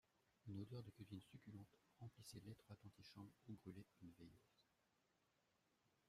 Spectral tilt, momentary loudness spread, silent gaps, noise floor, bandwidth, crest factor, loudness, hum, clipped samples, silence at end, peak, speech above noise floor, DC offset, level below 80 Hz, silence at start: -6 dB/octave; 8 LU; none; -85 dBFS; 15 kHz; 20 dB; -61 LUFS; none; under 0.1%; 1.45 s; -42 dBFS; 24 dB; under 0.1%; -86 dBFS; 0.25 s